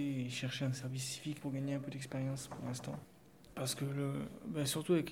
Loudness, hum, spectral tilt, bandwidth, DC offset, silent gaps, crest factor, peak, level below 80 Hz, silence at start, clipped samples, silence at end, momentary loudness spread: -40 LUFS; none; -5 dB/octave; 16.5 kHz; under 0.1%; none; 18 dB; -22 dBFS; -70 dBFS; 0 s; under 0.1%; 0 s; 6 LU